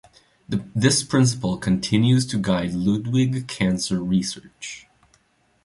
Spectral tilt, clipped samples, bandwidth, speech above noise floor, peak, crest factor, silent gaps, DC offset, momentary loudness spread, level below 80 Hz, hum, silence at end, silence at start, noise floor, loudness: -5 dB/octave; under 0.1%; 11.5 kHz; 41 dB; -4 dBFS; 18 dB; none; under 0.1%; 14 LU; -50 dBFS; none; 0.85 s; 0.5 s; -62 dBFS; -22 LUFS